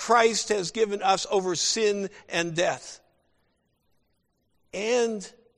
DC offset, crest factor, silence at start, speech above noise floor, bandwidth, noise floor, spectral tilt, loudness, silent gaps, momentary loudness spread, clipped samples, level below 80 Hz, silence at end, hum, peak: under 0.1%; 20 dB; 0 s; 47 dB; 12.5 kHz; -72 dBFS; -2.5 dB/octave; -25 LUFS; none; 11 LU; under 0.1%; -66 dBFS; 0.25 s; none; -8 dBFS